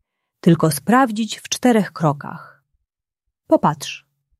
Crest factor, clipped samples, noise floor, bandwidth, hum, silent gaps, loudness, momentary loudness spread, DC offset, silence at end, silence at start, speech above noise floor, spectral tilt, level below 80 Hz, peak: 18 dB; under 0.1%; -80 dBFS; 14.5 kHz; none; none; -18 LUFS; 14 LU; under 0.1%; 0.4 s; 0.45 s; 62 dB; -5.5 dB/octave; -60 dBFS; -2 dBFS